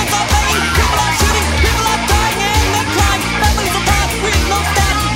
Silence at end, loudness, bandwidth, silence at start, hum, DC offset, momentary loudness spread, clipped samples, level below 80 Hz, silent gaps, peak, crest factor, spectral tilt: 0 s; -13 LUFS; 16.5 kHz; 0 s; none; under 0.1%; 1 LU; under 0.1%; -20 dBFS; none; -2 dBFS; 12 dB; -3.5 dB/octave